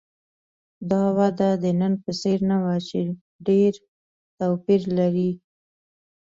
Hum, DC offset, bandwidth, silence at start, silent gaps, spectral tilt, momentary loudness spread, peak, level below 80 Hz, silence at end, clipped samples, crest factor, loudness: none; under 0.1%; 7.6 kHz; 0.8 s; 3.21-3.39 s, 3.88-4.38 s; -8 dB/octave; 9 LU; -8 dBFS; -62 dBFS; 0.85 s; under 0.1%; 16 dB; -23 LUFS